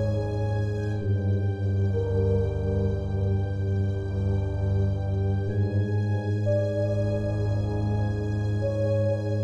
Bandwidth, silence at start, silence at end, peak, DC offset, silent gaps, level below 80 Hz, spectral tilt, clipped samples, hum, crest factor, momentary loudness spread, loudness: 7 kHz; 0 s; 0 s; -14 dBFS; under 0.1%; none; -38 dBFS; -9 dB/octave; under 0.1%; none; 12 dB; 2 LU; -27 LUFS